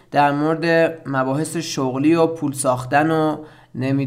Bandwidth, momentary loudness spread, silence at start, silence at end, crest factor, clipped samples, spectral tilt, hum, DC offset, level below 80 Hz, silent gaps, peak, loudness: 16 kHz; 7 LU; 0.1 s; 0 s; 16 dB; under 0.1%; -5.5 dB/octave; none; under 0.1%; -58 dBFS; none; -4 dBFS; -19 LUFS